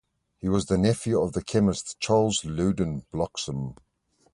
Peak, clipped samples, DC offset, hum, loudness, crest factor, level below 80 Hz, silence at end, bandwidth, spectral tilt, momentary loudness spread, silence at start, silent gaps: -8 dBFS; under 0.1%; under 0.1%; none; -26 LUFS; 18 dB; -46 dBFS; 0.6 s; 11.5 kHz; -5.5 dB/octave; 9 LU; 0.45 s; none